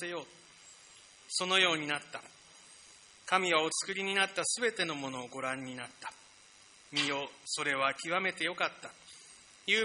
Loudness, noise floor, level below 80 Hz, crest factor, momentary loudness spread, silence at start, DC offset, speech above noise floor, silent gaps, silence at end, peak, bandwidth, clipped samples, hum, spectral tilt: -32 LUFS; -59 dBFS; -80 dBFS; 24 dB; 24 LU; 0 s; under 0.1%; 25 dB; none; 0 s; -10 dBFS; 10.5 kHz; under 0.1%; none; -1.5 dB/octave